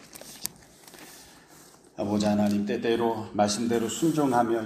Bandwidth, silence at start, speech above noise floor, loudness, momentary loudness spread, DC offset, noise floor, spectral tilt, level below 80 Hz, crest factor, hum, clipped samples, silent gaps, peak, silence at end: 15.5 kHz; 0.05 s; 28 dB; -27 LUFS; 21 LU; under 0.1%; -53 dBFS; -5 dB/octave; -62 dBFS; 24 dB; none; under 0.1%; none; -4 dBFS; 0 s